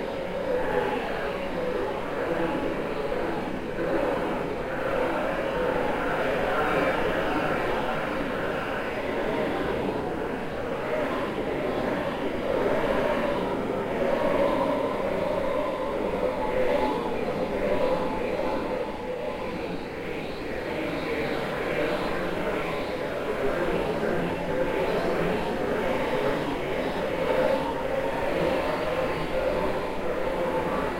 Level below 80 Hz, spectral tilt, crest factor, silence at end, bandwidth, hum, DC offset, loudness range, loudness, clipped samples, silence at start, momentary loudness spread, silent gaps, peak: -42 dBFS; -6 dB/octave; 16 dB; 0 s; 16 kHz; none; under 0.1%; 3 LU; -28 LUFS; under 0.1%; 0 s; 5 LU; none; -12 dBFS